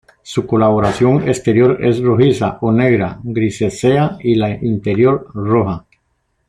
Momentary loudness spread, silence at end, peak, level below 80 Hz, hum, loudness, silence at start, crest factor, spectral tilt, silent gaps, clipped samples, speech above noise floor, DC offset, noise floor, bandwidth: 7 LU; 0.7 s; 0 dBFS; -44 dBFS; none; -15 LUFS; 0.25 s; 14 dB; -7.5 dB/octave; none; under 0.1%; 51 dB; under 0.1%; -65 dBFS; 11.5 kHz